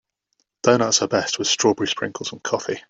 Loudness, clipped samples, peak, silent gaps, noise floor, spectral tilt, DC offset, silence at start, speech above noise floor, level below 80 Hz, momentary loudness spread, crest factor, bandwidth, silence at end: -20 LUFS; under 0.1%; -2 dBFS; none; -72 dBFS; -2.5 dB/octave; under 0.1%; 0.65 s; 51 dB; -64 dBFS; 8 LU; 20 dB; 8.2 kHz; 0.1 s